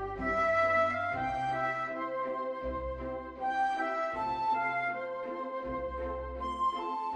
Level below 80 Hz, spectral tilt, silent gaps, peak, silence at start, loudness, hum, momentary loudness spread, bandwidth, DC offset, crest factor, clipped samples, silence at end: -50 dBFS; -6 dB/octave; none; -18 dBFS; 0 s; -33 LUFS; none; 10 LU; 10 kHz; under 0.1%; 16 dB; under 0.1%; 0 s